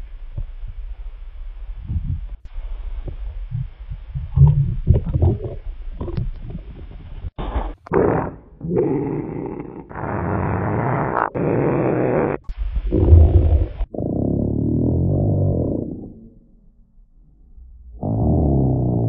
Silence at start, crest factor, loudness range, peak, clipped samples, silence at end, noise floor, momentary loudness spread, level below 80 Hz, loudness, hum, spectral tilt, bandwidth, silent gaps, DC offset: 0 s; 20 dB; 8 LU; 0 dBFS; under 0.1%; 0 s; -50 dBFS; 20 LU; -26 dBFS; -20 LUFS; none; -12.5 dB/octave; 3.8 kHz; none; under 0.1%